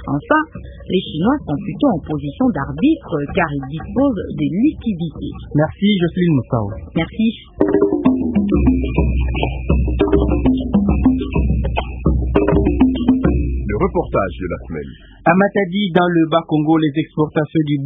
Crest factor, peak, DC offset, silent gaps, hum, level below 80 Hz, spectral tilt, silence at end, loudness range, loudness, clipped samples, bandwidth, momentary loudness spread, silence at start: 16 dB; 0 dBFS; under 0.1%; none; none; -26 dBFS; -11.5 dB/octave; 0 s; 2 LU; -17 LUFS; under 0.1%; 3.8 kHz; 8 LU; 0 s